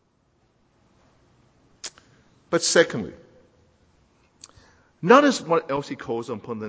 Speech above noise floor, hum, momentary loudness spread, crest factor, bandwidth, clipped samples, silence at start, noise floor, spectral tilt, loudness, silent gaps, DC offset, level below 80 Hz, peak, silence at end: 44 dB; none; 22 LU; 24 dB; 8 kHz; under 0.1%; 1.85 s; -65 dBFS; -3.5 dB/octave; -21 LUFS; none; under 0.1%; -64 dBFS; -2 dBFS; 0 s